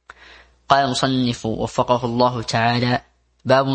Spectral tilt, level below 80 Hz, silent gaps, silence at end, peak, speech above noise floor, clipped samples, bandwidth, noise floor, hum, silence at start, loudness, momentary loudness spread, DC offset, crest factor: -5.5 dB/octave; -48 dBFS; none; 0 s; 0 dBFS; 29 dB; under 0.1%; 8.8 kHz; -47 dBFS; none; 0.7 s; -19 LUFS; 6 LU; under 0.1%; 20 dB